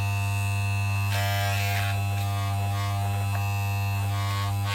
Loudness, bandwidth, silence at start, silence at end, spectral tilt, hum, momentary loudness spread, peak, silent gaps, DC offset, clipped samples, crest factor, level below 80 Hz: -27 LUFS; 16.5 kHz; 0 s; 0 s; -4.5 dB/octave; none; 2 LU; -14 dBFS; none; under 0.1%; under 0.1%; 12 dB; -52 dBFS